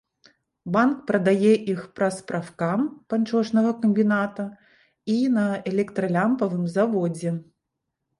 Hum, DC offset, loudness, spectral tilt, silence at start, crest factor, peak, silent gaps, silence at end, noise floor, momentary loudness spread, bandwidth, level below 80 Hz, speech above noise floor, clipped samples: none; under 0.1%; -23 LUFS; -7 dB/octave; 0.65 s; 16 dB; -8 dBFS; none; 0.75 s; -81 dBFS; 10 LU; 11.5 kHz; -68 dBFS; 58 dB; under 0.1%